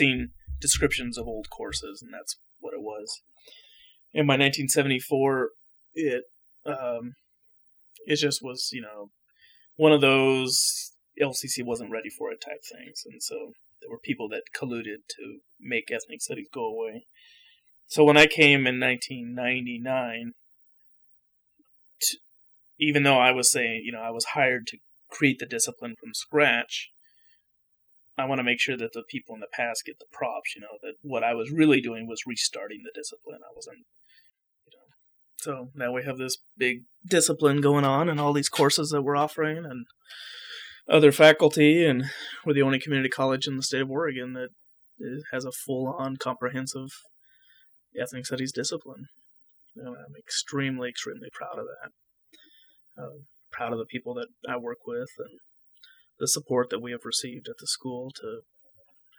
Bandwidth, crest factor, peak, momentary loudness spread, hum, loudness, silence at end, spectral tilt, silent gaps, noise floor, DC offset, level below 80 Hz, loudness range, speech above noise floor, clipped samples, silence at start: over 20 kHz; 24 dB; -4 dBFS; 21 LU; none; -25 LUFS; 0.8 s; -3.5 dB/octave; none; -70 dBFS; under 0.1%; -56 dBFS; 14 LU; 44 dB; under 0.1%; 0 s